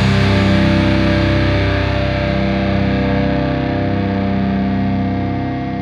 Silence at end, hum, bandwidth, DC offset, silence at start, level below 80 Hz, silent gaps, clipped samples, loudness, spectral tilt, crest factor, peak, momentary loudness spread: 0 s; none; 9.6 kHz; under 0.1%; 0 s; -26 dBFS; none; under 0.1%; -16 LUFS; -7.5 dB/octave; 14 dB; -2 dBFS; 5 LU